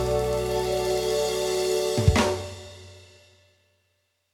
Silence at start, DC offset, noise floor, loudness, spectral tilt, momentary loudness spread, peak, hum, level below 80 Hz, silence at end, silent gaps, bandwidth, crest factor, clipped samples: 0 s; under 0.1%; -72 dBFS; -25 LUFS; -5 dB/octave; 18 LU; -6 dBFS; none; -38 dBFS; 1.3 s; none; 18.5 kHz; 22 dB; under 0.1%